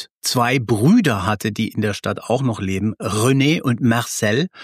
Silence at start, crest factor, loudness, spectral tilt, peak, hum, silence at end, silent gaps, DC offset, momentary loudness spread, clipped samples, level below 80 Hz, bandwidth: 0 s; 14 dB; -18 LUFS; -5 dB/octave; -4 dBFS; none; 0 s; 0.11-0.21 s; under 0.1%; 7 LU; under 0.1%; -54 dBFS; 15.5 kHz